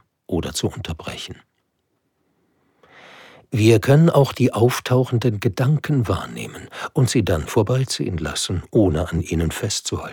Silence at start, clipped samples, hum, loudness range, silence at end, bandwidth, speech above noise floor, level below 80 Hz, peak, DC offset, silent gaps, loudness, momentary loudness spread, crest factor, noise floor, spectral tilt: 0.3 s; under 0.1%; none; 9 LU; 0 s; 19 kHz; 51 dB; -40 dBFS; -2 dBFS; under 0.1%; none; -20 LUFS; 14 LU; 18 dB; -71 dBFS; -6 dB/octave